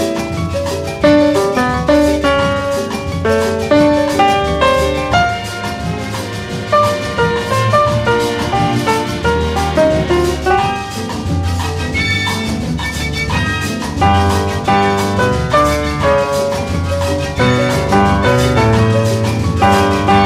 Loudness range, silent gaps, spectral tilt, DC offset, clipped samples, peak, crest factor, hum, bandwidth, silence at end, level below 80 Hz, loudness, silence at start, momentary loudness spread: 3 LU; none; -5.5 dB/octave; under 0.1%; under 0.1%; 0 dBFS; 12 dB; none; 16 kHz; 0 s; -28 dBFS; -14 LUFS; 0 s; 7 LU